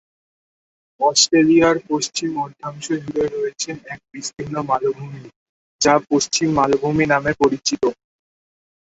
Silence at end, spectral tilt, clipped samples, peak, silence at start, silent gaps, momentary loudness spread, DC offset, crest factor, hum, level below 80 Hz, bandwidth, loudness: 1 s; -3.5 dB/octave; under 0.1%; 0 dBFS; 1 s; 5.36-5.79 s; 16 LU; under 0.1%; 20 dB; none; -54 dBFS; 8.2 kHz; -18 LUFS